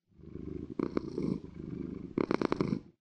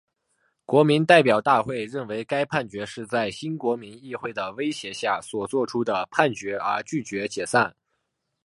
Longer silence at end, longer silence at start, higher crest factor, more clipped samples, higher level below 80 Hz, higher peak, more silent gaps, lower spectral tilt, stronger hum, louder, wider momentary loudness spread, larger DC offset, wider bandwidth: second, 0.1 s vs 0.75 s; second, 0.2 s vs 0.7 s; about the same, 26 dB vs 24 dB; neither; first, -56 dBFS vs -66 dBFS; second, -10 dBFS vs 0 dBFS; neither; first, -8 dB/octave vs -5 dB/octave; neither; second, -36 LUFS vs -24 LUFS; about the same, 12 LU vs 13 LU; neither; second, 9.2 kHz vs 11.5 kHz